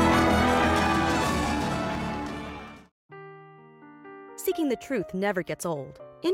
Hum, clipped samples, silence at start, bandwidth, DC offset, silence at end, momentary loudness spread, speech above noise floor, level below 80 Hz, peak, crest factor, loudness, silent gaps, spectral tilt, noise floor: none; under 0.1%; 0 s; 16.5 kHz; under 0.1%; 0 s; 24 LU; 21 dB; -42 dBFS; -10 dBFS; 18 dB; -26 LUFS; 2.91-3.09 s; -5 dB/octave; -50 dBFS